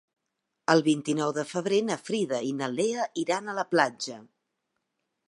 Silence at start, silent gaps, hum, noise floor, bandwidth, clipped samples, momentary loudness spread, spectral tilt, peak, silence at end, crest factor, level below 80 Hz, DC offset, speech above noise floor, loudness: 0.7 s; none; none; -82 dBFS; 11.5 kHz; under 0.1%; 8 LU; -4.5 dB/octave; -6 dBFS; 1.05 s; 22 dB; -82 dBFS; under 0.1%; 55 dB; -28 LUFS